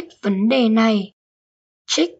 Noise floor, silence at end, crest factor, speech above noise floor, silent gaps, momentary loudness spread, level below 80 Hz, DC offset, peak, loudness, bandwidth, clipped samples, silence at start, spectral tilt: under -90 dBFS; 0.1 s; 14 dB; over 72 dB; 1.13-1.85 s; 8 LU; -70 dBFS; under 0.1%; -6 dBFS; -18 LUFS; 8 kHz; under 0.1%; 0 s; -4.5 dB/octave